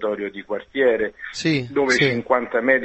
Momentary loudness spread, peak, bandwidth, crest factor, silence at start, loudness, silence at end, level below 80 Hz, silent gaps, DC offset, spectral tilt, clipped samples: 10 LU; -2 dBFS; 8.4 kHz; 18 dB; 0 s; -21 LUFS; 0 s; -56 dBFS; none; under 0.1%; -5 dB/octave; under 0.1%